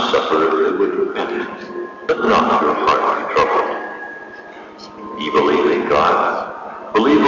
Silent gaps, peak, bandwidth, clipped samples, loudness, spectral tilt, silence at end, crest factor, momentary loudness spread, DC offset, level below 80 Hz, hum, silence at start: none; -6 dBFS; 7.4 kHz; under 0.1%; -17 LUFS; -5 dB/octave; 0 s; 12 dB; 17 LU; under 0.1%; -50 dBFS; none; 0 s